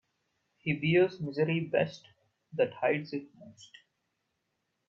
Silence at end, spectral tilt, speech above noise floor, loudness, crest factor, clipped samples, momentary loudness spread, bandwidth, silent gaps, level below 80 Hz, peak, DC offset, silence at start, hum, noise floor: 1.25 s; -7.5 dB/octave; 51 dB; -31 LUFS; 20 dB; under 0.1%; 15 LU; 7.6 kHz; none; -72 dBFS; -12 dBFS; under 0.1%; 0.65 s; none; -81 dBFS